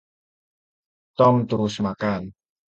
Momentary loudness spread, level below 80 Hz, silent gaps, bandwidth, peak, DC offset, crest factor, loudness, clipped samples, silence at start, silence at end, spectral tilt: 17 LU; -56 dBFS; none; 8.2 kHz; -4 dBFS; under 0.1%; 20 dB; -22 LUFS; under 0.1%; 1.2 s; 0.4 s; -7.5 dB/octave